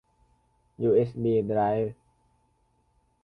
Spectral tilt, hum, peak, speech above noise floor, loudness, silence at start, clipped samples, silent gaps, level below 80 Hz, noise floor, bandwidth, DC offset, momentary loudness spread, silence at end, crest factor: -10.5 dB/octave; none; -12 dBFS; 44 dB; -26 LUFS; 0.8 s; under 0.1%; none; -60 dBFS; -69 dBFS; 5 kHz; under 0.1%; 6 LU; 1.3 s; 18 dB